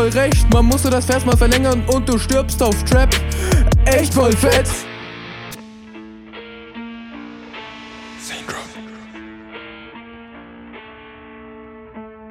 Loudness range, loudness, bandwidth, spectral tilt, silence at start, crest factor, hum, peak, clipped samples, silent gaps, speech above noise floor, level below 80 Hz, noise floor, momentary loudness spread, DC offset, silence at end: 19 LU; -16 LUFS; 17 kHz; -5 dB/octave; 0 s; 14 dB; none; -4 dBFS; under 0.1%; none; 25 dB; -22 dBFS; -39 dBFS; 24 LU; under 0.1%; 0 s